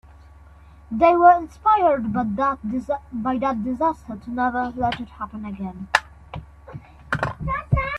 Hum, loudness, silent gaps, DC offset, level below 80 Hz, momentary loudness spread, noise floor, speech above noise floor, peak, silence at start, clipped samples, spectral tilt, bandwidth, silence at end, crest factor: none; -22 LUFS; none; under 0.1%; -42 dBFS; 22 LU; -47 dBFS; 26 dB; 0 dBFS; 0.9 s; under 0.1%; -7 dB/octave; 11.5 kHz; 0 s; 22 dB